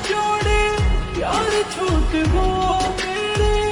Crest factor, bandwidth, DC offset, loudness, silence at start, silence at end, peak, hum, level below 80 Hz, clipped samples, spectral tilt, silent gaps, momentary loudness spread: 12 dB; 11.5 kHz; under 0.1%; -20 LUFS; 0 s; 0 s; -6 dBFS; none; -24 dBFS; under 0.1%; -5 dB/octave; none; 4 LU